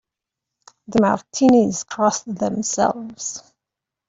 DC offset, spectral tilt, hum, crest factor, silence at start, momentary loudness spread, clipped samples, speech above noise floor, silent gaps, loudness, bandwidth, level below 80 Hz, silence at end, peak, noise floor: under 0.1%; -4.5 dB/octave; none; 18 dB; 0.9 s; 14 LU; under 0.1%; 66 dB; none; -20 LUFS; 8 kHz; -56 dBFS; 0.7 s; -4 dBFS; -85 dBFS